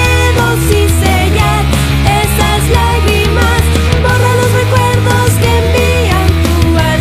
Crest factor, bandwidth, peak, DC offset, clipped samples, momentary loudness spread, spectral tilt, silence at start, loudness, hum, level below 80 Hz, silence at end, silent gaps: 8 dB; 16 kHz; 0 dBFS; under 0.1%; 0.4%; 1 LU; -5 dB/octave; 0 s; -10 LUFS; none; -16 dBFS; 0 s; none